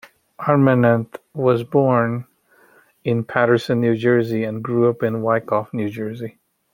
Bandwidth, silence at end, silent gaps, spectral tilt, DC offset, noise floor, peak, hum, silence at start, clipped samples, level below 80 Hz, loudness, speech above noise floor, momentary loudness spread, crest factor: 16.5 kHz; 0.45 s; none; -8.5 dB/octave; under 0.1%; -54 dBFS; -2 dBFS; none; 0.4 s; under 0.1%; -62 dBFS; -19 LUFS; 36 dB; 12 LU; 18 dB